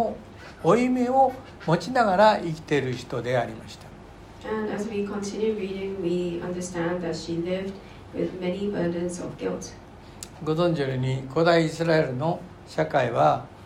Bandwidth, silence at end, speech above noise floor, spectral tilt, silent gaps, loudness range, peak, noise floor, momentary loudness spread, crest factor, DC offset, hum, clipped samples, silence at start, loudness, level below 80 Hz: 13.5 kHz; 0 s; 20 dB; -6 dB/octave; none; 7 LU; -6 dBFS; -45 dBFS; 19 LU; 20 dB; under 0.1%; none; under 0.1%; 0 s; -25 LUFS; -52 dBFS